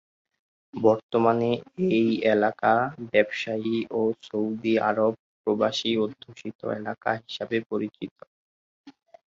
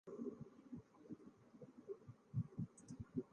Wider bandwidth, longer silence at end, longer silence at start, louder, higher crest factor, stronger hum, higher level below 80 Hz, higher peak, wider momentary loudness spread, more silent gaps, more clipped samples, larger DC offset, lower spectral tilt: second, 7.6 kHz vs 9.4 kHz; first, 0.35 s vs 0 s; first, 0.75 s vs 0.05 s; first, -25 LUFS vs -53 LUFS; about the same, 20 dB vs 20 dB; neither; about the same, -68 dBFS vs -72 dBFS; first, -6 dBFS vs -32 dBFS; second, 10 LU vs 13 LU; first, 1.03-1.09 s, 5.19-5.44 s, 6.55-6.59 s, 8.11-8.16 s, 8.27-8.84 s vs none; neither; neither; second, -6 dB/octave vs -9 dB/octave